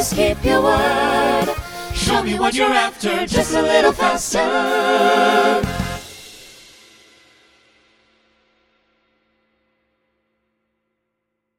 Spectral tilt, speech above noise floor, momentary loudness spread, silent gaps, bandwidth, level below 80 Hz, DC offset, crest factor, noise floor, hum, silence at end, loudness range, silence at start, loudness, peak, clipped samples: -3.5 dB/octave; 60 dB; 13 LU; none; 19.5 kHz; -38 dBFS; under 0.1%; 18 dB; -76 dBFS; none; 5.1 s; 8 LU; 0 s; -17 LUFS; 0 dBFS; under 0.1%